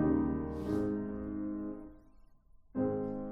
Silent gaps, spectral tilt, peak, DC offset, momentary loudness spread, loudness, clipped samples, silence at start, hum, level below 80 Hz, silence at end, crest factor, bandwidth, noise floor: none; -10 dB/octave; -18 dBFS; under 0.1%; 11 LU; -36 LUFS; under 0.1%; 0 s; none; -52 dBFS; 0 s; 16 dB; 6.2 kHz; -60 dBFS